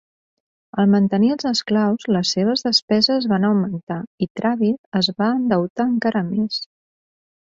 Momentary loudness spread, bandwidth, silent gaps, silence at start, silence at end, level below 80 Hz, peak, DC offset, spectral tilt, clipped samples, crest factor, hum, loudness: 9 LU; 7.6 kHz; 2.82-2.88 s, 3.83-3.87 s, 4.07-4.18 s, 4.30-4.35 s, 4.78-4.92 s, 5.70-5.76 s; 0.75 s; 0.8 s; -60 dBFS; -4 dBFS; under 0.1%; -5.5 dB/octave; under 0.1%; 16 dB; none; -19 LUFS